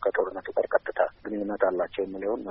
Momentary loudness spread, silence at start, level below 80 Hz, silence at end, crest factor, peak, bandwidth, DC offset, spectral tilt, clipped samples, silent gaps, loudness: 5 LU; 0 s; -60 dBFS; 0 s; 20 dB; -8 dBFS; 5.4 kHz; under 0.1%; -4 dB/octave; under 0.1%; none; -28 LUFS